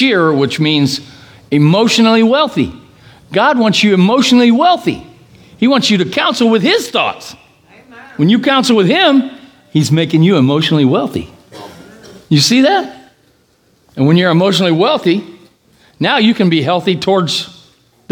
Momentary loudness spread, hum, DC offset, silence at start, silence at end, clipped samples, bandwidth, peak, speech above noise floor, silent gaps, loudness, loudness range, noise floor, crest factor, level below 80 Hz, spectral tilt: 10 LU; none; under 0.1%; 0 s; 0.6 s; under 0.1%; 18.5 kHz; 0 dBFS; 43 dB; none; -11 LUFS; 3 LU; -53 dBFS; 12 dB; -54 dBFS; -5.5 dB/octave